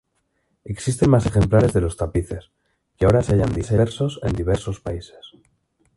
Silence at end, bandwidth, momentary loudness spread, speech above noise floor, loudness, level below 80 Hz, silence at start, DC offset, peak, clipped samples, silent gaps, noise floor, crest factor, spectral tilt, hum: 0.7 s; 11.5 kHz; 16 LU; 50 dB; -20 LUFS; -34 dBFS; 0.65 s; under 0.1%; -2 dBFS; under 0.1%; none; -70 dBFS; 20 dB; -7 dB/octave; none